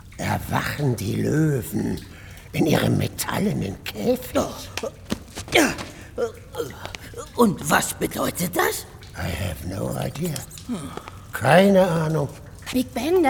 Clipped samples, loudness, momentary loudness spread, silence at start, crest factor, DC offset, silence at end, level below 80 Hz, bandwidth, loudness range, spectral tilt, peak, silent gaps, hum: under 0.1%; -23 LUFS; 14 LU; 0.05 s; 20 dB; under 0.1%; 0 s; -44 dBFS; 19.5 kHz; 4 LU; -5 dB/octave; -2 dBFS; none; none